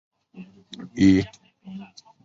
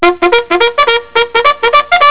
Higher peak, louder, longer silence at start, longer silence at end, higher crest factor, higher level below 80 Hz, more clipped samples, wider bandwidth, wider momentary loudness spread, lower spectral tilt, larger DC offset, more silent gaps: second, -6 dBFS vs 0 dBFS; second, -20 LUFS vs -9 LUFS; first, 0.35 s vs 0 s; first, 0.4 s vs 0 s; first, 20 dB vs 10 dB; second, -48 dBFS vs -42 dBFS; second, under 0.1% vs 2%; first, 7.6 kHz vs 4 kHz; first, 23 LU vs 3 LU; about the same, -6.5 dB/octave vs -6 dB/octave; second, under 0.1% vs 2%; neither